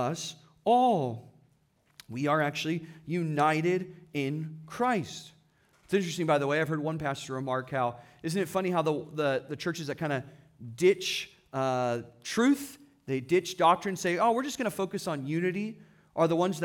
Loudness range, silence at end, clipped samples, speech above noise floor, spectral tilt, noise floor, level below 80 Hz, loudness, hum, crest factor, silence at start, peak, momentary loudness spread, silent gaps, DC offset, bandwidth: 3 LU; 0 s; under 0.1%; 39 dB; -5.5 dB/octave; -68 dBFS; -70 dBFS; -30 LUFS; none; 20 dB; 0 s; -10 dBFS; 12 LU; none; under 0.1%; 18 kHz